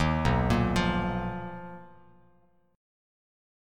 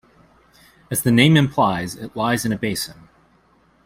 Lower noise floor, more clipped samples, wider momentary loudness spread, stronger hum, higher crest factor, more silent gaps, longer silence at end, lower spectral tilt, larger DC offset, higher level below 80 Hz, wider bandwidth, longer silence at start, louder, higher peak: first, -65 dBFS vs -57 dBFS; neither; first, 18 LU vs 13 LU; neither; about the same, 18 dB vs 18 dB; neither; first, 1.9 s vs 0.95 s; first, -6.5 dB/octave vs -5 dB/octave; neither; first, -40 dBFS vs -52 dBFS; second, 14.5 kHz vs 16 kHz; second, 0 s vs 0.9 s; second, -28 LUFS vs -19 LUFS; second, -12 dBFS vs -2 dBFS